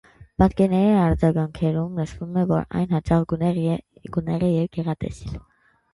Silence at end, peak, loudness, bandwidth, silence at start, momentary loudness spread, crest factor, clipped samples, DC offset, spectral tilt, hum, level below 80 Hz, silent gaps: 0.55 s; -4 dBFS; -22 LUFS; 11 kHz; 0.2 s; 12 LU; 18 dB; under 0.1%; under 0.1%; -9 dB/octave; none; -40 dBFS; none